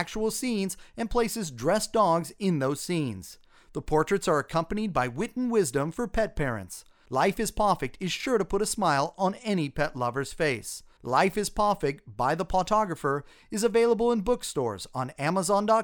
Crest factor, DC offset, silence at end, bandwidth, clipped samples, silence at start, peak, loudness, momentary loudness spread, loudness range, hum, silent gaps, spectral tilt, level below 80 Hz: 18 dB; under 0.1%; 0 s; over 20 kHz; under 0.1%; 0 s; -8 dBFS; -27 LUFS; 9 LU; 2 LU; none; none; -5 dB/octave; -46 dBFS